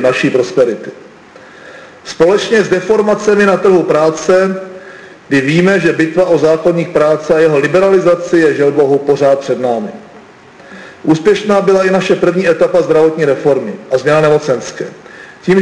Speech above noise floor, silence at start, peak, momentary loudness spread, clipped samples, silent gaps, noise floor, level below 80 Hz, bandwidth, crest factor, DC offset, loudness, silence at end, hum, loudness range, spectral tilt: 27 dB; 0 s; -2 dBFS; 9 LU; under 0.1%; none; -37 dBFS; -50 dBFS; 10.5 kHz; 10 dB; under 0.1%; -11 LUFS; 0 s; none; 3 LU; -6 dB/octave